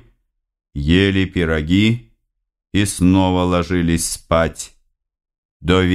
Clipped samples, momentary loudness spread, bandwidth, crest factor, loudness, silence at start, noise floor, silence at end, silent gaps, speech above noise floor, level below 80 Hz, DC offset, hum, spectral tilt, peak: under 0.1%; 11 LU; 14.5 kHz; 18 dB; -17 LUFS; 0.75 s; -68 dBFS; 0 s; 5.38-5.60 s; 52 dB; -34 dBFS; under 0.1%; none; -5.5 dB/octave; 0 dBFS